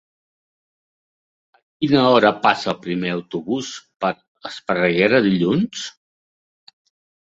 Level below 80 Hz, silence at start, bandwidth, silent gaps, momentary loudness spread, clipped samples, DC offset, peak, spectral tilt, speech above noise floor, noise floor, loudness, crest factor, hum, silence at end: -60 dBFS; 1.8 s; 8 kHz; 4.28-4.35 s; 16 LU; under 0.1%; under 0.1%; -2 dBFS; -5.5 dB/octave; over 72 dB; under -90 dBFS; -19 LUFS; 20 dB; none; 1.4 s